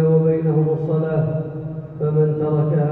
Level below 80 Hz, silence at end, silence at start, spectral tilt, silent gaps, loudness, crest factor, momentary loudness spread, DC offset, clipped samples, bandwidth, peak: -52 dBFS; 0 s; 0 s; -13 dB/octave; none; -20 LUFS; 12 dB; 10 LU; under 0.1%; under 0.1%; 2.9 kHz; -6 dBFS